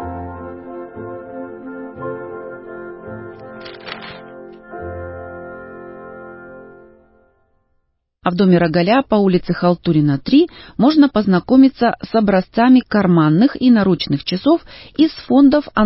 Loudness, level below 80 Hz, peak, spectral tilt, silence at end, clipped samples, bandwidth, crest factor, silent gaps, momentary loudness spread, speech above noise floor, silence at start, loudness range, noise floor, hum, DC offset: -14 LUFS; -46 dBFS; -2 dBFS; -11.5 dB/octave; 0 s; under 0.1%; 5.8 kHz; 16 dB; none; 22 LU; 52 dB; 0 s; 19 LU; -66 dBFS; none; under 0.1%